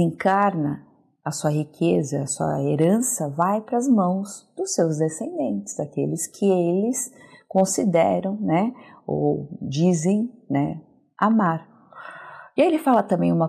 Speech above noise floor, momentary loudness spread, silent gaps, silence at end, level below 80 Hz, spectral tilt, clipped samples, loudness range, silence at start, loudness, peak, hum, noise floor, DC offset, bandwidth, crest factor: 20 dB; 11 LU; none; 0 s; -66 dBFS; -6 dB/octave; under 0.1%; 2 LU; 0 s; -22 LUFS; -6 dBFS; none; -42 dBFS; under 0.1%; 15 kHz; 16 dB